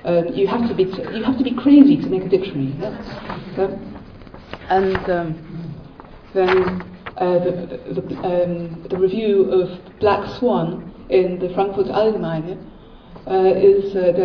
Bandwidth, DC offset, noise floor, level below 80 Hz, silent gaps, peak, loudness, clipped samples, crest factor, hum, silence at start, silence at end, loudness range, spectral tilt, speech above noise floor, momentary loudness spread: 5.4 kHz; under 0.1%; -40 dBFS; -46 dBFS; none; 0 dBFS; -19 LUFS; under 0.1%; 18 dB; none; 0 s; 0 s; 5 LU; -9 dB/octave; 23 dB; 17 LU